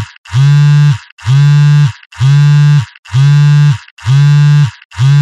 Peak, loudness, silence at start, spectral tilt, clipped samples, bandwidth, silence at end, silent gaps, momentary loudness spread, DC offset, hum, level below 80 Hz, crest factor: 0 dBFS; -9 LUFS; 0 s; -7 dB/octave; under 0.1%; 8 kHz; 0 s; 0.18-0.24 s, 1.12-1.17 s, 2.06-2.10 s, 2.99-3.03 s, 3.91-3.97 s, 4.85-4.90 s; 8 LU; under 0.1%; none; -46 dBFS; 6 dB